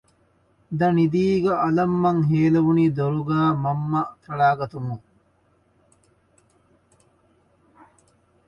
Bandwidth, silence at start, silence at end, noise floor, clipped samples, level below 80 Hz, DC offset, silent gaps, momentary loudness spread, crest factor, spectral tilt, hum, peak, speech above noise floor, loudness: 7 kHz; 0.7 s; 3.5 s; -63 dBFS; under 0.1%; -56 dBFS; under 0.1%; none; 11 LU; 16 dB; -9 dB/octave; none; -8 dBFS; 42 dB; -21 LUFS